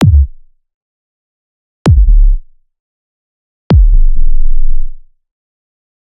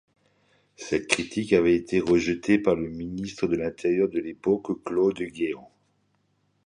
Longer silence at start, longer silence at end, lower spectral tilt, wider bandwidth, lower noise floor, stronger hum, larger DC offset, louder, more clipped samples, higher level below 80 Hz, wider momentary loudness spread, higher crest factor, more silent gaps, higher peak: second, 0 s vs 0.8 s; about the same, 1.05 s vs 1 s; first, -8.5 dB/octave vs -5.5 dB/octave; second, 5.4 kHz vs 10.5 kHz; second, -28 dBFS vs -70 dBFS; neither; neither; first, -13 LUFS vs -25 LUFS; first, 0.2% vs under 0.1%; first, -10 dBFS vs -54 dBFS; first, 13 LU vs 9 LU; second, 8 dB vs 24 dB; first, 0.74-1.85 s, 2.80-3.70 s vs none; about the same, 0 dBFS vs -2 dBFS